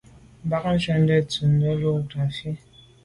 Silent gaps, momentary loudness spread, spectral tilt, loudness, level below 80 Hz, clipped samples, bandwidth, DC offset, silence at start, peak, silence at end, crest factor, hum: none; 13 LU; -7 dB/octave; -23 LUFS; -50 dBFS; under 0.1%; 11 kHz; under 0.1%; 0.45 s; -8 dBFS; 0.5 s; 16 dB; none